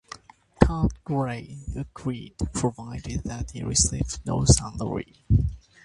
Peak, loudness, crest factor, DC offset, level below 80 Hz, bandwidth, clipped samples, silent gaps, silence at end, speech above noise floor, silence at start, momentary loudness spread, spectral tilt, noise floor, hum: 0 dBFS; -26 LUFS; 26 dB; under 0.1%; -34 dBFS; 11.5 kHz; under 0.1%; none; 0.25 s; 21 dB; 0.6 s; 14 LU; -5 dB/octave; -47 dBFS; none